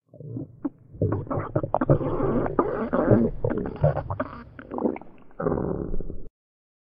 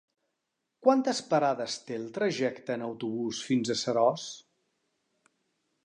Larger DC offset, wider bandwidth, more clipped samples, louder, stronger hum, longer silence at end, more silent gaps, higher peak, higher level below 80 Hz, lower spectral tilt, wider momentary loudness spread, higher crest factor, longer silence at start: neither; second, 4.9 kHz vs 11 kHz; neither; first, -26 LUFS vs -29 LUFS; neither; second, 0.65 s vs 1.45 s; neither; first, -4 dBFS vs -8 dBFS; first, -38 dBFS vs -80 dBFS; first, -10 dB/octave vs -4.5 dB/octave; first, 16 LU vs 10 LU; about the same, 22 dB vs 22 dB; second, 0.15 s vs 0.8 s